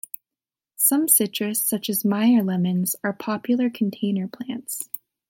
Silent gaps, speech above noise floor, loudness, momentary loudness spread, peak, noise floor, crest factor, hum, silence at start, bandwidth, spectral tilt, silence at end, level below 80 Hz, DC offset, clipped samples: none; over 68 dB; -22 LUFS; 13 LU; -4 dBFS; under -90 dBFS; 20 dB; none; 0.8 s; 17 kHz; -4 dB/octave; 0.3 s; -74 dBFS; under 0.1%; under 0.1%